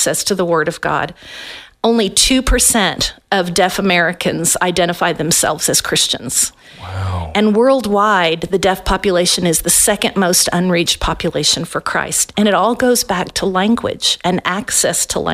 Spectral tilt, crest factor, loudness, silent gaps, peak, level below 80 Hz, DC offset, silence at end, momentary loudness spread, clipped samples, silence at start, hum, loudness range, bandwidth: -2.5 dB/octave; 16 dB; -14 LUFS; none; 0 dBFS; -32 dBFS; under 0.1%; 0 s; 7 LU; under 0.1%; 0 s; none; 2 LU; 16 kHz